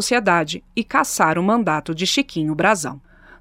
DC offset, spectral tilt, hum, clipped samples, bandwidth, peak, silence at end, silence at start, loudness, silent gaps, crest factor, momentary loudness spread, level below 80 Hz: under 0.1%; -3.5 dB/octave; none; under 0.1%; 16.5 kHz; -2 dBFS; 0.45 s; 0 s; -19 LUFS; none; 18 dB; 7 LU; -52 dBFS